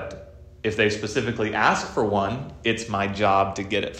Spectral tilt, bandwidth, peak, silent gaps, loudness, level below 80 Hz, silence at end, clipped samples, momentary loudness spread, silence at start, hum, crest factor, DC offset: -4.5 dB/octave; 12 kHz; -4 dBFS; none; -23 LUFS; -50 dBFS; 0 s; under 0.1%; 8 LU; 0 s; none; 20 dB; under 0.1%